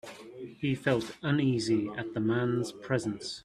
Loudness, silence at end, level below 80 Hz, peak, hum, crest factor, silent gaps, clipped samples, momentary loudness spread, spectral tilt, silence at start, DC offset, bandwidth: -31 LUFS; 0.05 s; -66 dBFS; -12 dBFS; none; 18 dB; none; under 0.1%; 8 LU; -6 dB/octave; 0.05 s; under 0.1%; 13 kHz